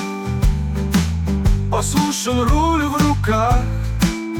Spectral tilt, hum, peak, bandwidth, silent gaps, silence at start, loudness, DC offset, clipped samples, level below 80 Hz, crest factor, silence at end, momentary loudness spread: -5.5 dB/octave; none; -6 dBFS; 18 kHz; none; 0 s; -18 LUFS; under 0.1%; under 0.1%; -22 dBFS; 12 dB; 0 s; 4 LU